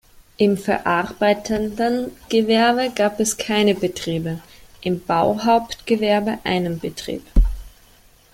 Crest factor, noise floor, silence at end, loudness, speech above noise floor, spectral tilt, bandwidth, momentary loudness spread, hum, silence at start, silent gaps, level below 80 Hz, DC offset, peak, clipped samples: 18 dB; -51 dBFS; 0.65 s; -20 LUFS; 32 dB; -4.5 dB/octave; 17 kHz; 8 LU; none; 0.4 s; none; -30 dBFS; under 0.1%; -2 dBFS; under 0.1%